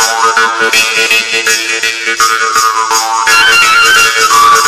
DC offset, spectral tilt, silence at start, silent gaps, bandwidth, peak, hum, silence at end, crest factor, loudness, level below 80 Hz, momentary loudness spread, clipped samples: under 0.1%; 1.5 dB/octave; 0 s; none; over 20 kHz; 0 dBFS; none; 0 s; 8 dB; -7 LUFS; -46 dBFS; 6 LU; 0.6%